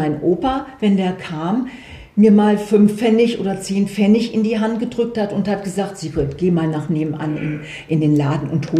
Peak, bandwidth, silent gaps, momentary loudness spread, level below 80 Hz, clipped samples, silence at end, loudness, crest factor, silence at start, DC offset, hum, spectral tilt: -2 dBFS; 12 kHz; none; 10 LU; -46 dBFS; under 0.1%; 0 s; -18 LUFS; 14 dB; 0 s; under 0.1%; none; -7 dB/octave